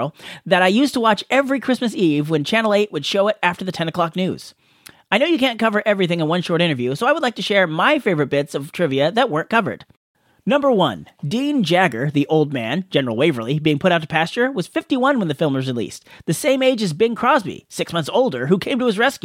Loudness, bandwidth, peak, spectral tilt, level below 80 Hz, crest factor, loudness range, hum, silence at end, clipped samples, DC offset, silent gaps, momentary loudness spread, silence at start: -18 LUFS; 16.5 kHz; 0 dBFS; -5.5 dB/octave; -62 dBFS; 18 dB; 2 LU; none; 0.05 s; under 0.1%; under 0.1%; 9.97-10.15 s; 8 LU; 0 s